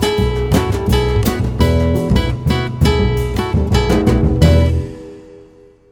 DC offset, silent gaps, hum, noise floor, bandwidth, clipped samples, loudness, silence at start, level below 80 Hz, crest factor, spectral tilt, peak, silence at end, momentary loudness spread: under 0.1%; none; none; -44 dBFS; over 20 kHz; under 0.1%; -15 LUFS; 0 s; -20 dBFS; 14 dB; -6.5 dB/octave; 0 dBFS; 0.5 s; 6 LU